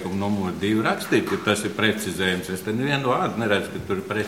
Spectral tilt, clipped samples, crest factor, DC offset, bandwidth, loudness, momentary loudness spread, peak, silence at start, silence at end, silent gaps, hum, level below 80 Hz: -5 dB/octave; under 0.1%; 20 dB; 0.1%; 16.5 kHz; -23 LUFS; 5 LU; -4 dBFS; 0 s; 0 s; none; none; -54 dBFS